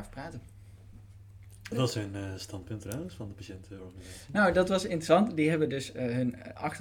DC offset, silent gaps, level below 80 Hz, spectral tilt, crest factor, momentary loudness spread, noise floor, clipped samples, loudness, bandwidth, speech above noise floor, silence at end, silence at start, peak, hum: under 0.1%; none; -56 dBFS; -6 dB/octave; 20 dB; 21 LU; -51 dBFS; under 0.1%; -30 LUFS; 18.5 kHz; 20 dB; 0 s; 0 s; -10 dBFS; none